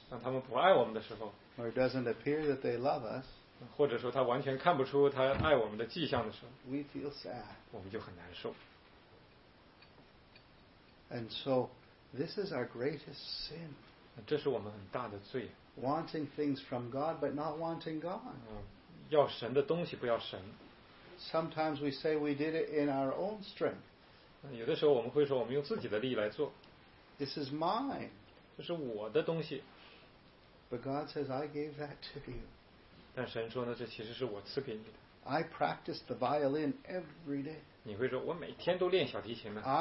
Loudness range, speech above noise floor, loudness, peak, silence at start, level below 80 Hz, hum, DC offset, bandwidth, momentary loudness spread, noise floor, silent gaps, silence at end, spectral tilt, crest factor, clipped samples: 9 LU; 26 dB; -37 LUFS; -14 dBFS; 0 s; -64 dBFS; none; under 0.1%; 5.8 kHz; 17 LU; -62 dBFS; none; 0 s; -4.5 dB/octave; 24 dB; under 0.1%